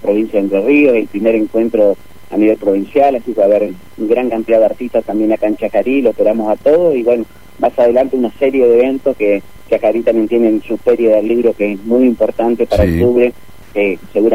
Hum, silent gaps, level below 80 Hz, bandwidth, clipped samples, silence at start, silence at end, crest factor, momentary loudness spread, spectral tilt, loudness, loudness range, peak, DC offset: none; none; -36 dBFS; 16 kHz; under 0.1%; 0.05 s; 0 s; 12 dB; 6 LU; -8 dB/octave; -13 LUFS; 1 LU; 0 dBFS; 2%